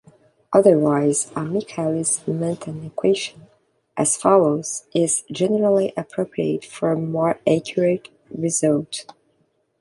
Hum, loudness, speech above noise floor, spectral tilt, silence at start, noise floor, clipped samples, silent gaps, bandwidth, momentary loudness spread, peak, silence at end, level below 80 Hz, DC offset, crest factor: none; -20 LUFS; 46 dB; -5 dB/octave; 0.5 s; -66 dBFS; under 0.1%; none; 11.5 kHz; 11 LU; -2 dBFS; 0.8 s; -64 dBFS; under 0.1%; 20 dB